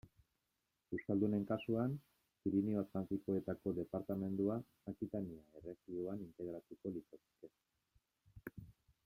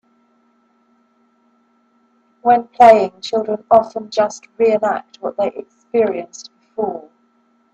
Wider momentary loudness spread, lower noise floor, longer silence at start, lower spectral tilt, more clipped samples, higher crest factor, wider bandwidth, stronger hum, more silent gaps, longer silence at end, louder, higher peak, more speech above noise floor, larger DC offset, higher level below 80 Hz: second, 16 LU vs 19 LU; first, -87 dBFS vs -59 dBFS; second, 0.05 s vs 2.45 s; first, -9.5 dB/octave vs -4.5 dB/octave; neither; about the same, 18 dB vs 18 dB; first, 15.5 kHz vs 8.4 kHz; neither; neither; second, 0.35 s vs 0.7 s; second, -42 LUFS vs -16 LUFS; second, -24 dBFS vs 0 dBFS; about the same, 46 dB vs 44 dB; neither; second, -72 dBFS vs -62 dBFS